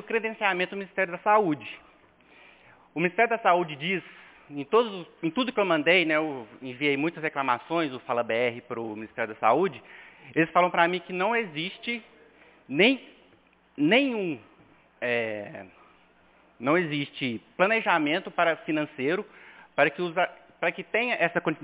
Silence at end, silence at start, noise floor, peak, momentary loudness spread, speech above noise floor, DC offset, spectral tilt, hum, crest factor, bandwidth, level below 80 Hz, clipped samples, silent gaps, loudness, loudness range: 0 s; 0 s; -61 dBFS; -6 dBFS; 13 LU; 34 dB; under 0.1%; -8.5 dB/octave; none; 22 dB; 4 kHz; -74 dBFS; under 0.1%; none; -26 LUFS; 3 LU